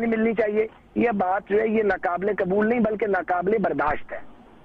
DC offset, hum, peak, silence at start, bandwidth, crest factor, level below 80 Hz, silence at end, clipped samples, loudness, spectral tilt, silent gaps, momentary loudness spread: under 0.1%; none; -12 dBFS; 0 s; 5.2 kHz; 12 dB; -52 dBFS; 0.3 s; under 0.1%; -23 LUFS; -9 dB/octave; none; 5 LU